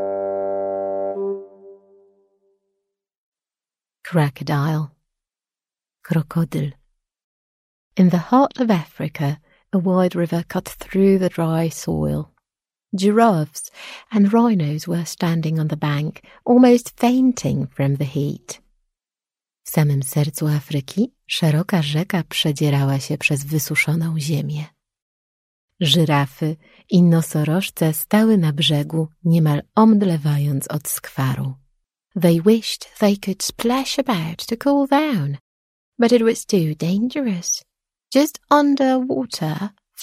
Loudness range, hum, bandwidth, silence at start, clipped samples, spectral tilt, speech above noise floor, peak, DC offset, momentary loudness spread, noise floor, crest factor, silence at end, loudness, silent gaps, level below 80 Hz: 8 LU; none; 16 kHz; 0 s; under 0.1%; -6 dB/octave; over 72 dB; -2 dBFS; under 0.1%; 12 LU; under -90 dBFS; 18 dB; 0 s; -19 LUFS; 3.17-3.32 s, 7.24-7.91 s, 25.02-25.68 s, 35.40-35.92 s; -54 dBFS